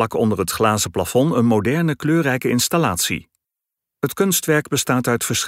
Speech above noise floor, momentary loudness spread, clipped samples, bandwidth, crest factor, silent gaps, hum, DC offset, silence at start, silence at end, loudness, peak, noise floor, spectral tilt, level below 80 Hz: 66 dB; 4 LU; under 0.1%; 16.5 kHz; 16 dB; none; none; under 0.1%; 0 s; 0 s; -19 LUFS; -2 dBFS; -84 dBFS; -4.5 dB/octave; -52 dBFS